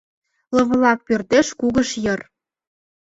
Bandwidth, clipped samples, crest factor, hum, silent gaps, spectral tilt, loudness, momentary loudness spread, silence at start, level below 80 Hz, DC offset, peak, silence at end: 8 kHz; under 0.1%; 18 dB; none; none; -4.5 dB/octave; -19 LUFS; 7 LU; 0.5 s; -50 dBFS; under 0.1%; -2 dBFS; 0.95 s